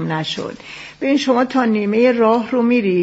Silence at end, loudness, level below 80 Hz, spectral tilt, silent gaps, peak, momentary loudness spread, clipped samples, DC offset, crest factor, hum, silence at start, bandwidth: 0 s; -16 LUFS; -58 dBFS; -4.5 dB/octave; none; -2 dBFS; 13 LU; under 0.1%; under 0.1%; 14 dB; none; 0 s; 8 kHz